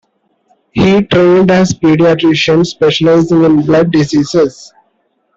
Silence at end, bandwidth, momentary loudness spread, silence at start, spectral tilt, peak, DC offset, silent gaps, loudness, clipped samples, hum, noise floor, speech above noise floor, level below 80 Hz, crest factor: 0.85 s; 7.8 kHz; 4 LU; 0.75 s; -6 dB/octave; -2 dBFS; under 0.1%; none; -9 LUFS; under 0.1%; none; -60 dBFS; 51 dB; -42 dBFS; 8 dB